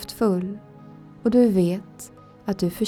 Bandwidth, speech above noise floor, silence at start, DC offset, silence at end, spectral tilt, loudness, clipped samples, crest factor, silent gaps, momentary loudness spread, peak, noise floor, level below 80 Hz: 17.5 kHz; 23 dB; 0 s; under 0.1%; 0 s; -7 dB/octave; -23 LUFS; under 0.1%; 16 dB; none; 23 LU; -8 dBFS; -44 dBFS; -54 dBFS